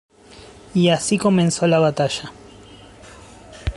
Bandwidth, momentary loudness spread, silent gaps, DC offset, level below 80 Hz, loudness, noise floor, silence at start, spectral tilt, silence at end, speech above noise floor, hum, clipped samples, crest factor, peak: 11.5 kHz; 12 LU; none; under 0.1%; -40 dBFS; -18 LUFS; -44 dBFS; 0.35 s; -5 dB/octave; 0 s; 26 dB; none; under 0.1%; 16 dB; -4 dBFS